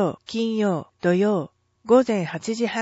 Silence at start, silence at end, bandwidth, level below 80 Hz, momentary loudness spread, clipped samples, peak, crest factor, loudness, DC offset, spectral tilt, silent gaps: 0 s; 0 s; 8 kHz; -66 dBFS; 9 LU; under 0.1%; -6 dBFS; 16 dB; -22 LUFS; under 0.1%; -6 dB/octave; none